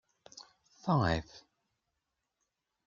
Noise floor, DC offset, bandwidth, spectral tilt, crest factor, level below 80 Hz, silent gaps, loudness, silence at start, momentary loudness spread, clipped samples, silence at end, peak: -85 dBFS; under 0.1%; 7.4 kHz; -6.5 dB/octave; 22 dB; -58 dBFS; none; -33 LUFS; 0.35 s; 24 LU; under 0.1%; 1.5 s; -16 dBFS